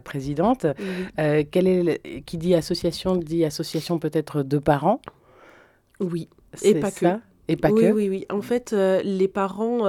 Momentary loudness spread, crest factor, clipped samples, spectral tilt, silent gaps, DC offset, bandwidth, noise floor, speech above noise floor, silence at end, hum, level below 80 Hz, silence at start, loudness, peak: 9 LU; 20 dB; under 0.1%; -6.5 dB/octave; none; under 0.1%; 17 kHz; -54 dBFS; 32 dB; 0 s; none; -52 dBFS; 0.05 s; -23 LUFS; -4 dBFS